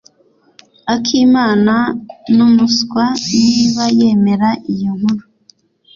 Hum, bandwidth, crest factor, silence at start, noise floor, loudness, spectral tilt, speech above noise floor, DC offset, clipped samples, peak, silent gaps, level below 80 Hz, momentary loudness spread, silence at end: none; 7.4 kHz; 12 dB; 0.85 s; -53 dBFS; -13 LUFS; -5 dB/octave; 41 dB; under 0.1%; under 0.1%; -2 dBFS; none; -52 dBFS; 9 LU; 0.75 s